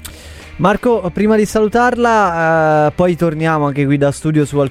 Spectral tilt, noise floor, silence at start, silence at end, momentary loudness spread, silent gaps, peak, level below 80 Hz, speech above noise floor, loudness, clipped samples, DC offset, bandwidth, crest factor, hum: -6.5 dB/octave; -33 dBFS; 0 s; 0 s; 4 LU; none; 0 dBFS; -40 dBFS; 20 dB; -14 LUFS; under 0.1%; under 0.1%; 15.5 kHz; 14 dB; none